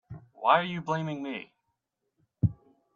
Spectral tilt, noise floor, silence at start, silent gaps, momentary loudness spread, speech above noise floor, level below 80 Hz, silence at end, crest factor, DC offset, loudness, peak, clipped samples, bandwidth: -7 dB/octave; -81 dBFS; 0.1 s; none; 14 LU; 53 dB; -58 dBFS; 0.4 s; 24 dB; under 0.1%; -29 LUFS; -8 dBFS; under 0.1%; 7.4 kHz